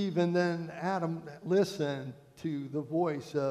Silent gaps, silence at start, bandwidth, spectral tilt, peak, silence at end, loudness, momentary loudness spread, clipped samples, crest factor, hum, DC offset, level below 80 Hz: none; 0 s; 13.5 kHz; -7 dB/octave; -16 dBFS; 0 s; -33 LUFS; 11 LU; under 0.1%; 16 dB; none; under 0.1%; -74 dBFS